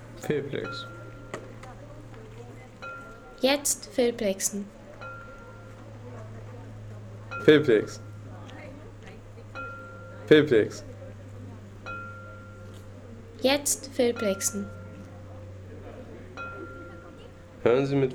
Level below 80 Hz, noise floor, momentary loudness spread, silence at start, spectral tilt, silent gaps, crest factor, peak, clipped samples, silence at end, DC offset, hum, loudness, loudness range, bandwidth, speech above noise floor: -54 dBFS; -46 dBFS; 21 LU; 0 s; -4 dB/octave; none; 24 dB; -6 dBFS; under 0.1%; 0 s; under 0.1%; none; -26 LUFS; 7 LU; 19 kHz; 22 dB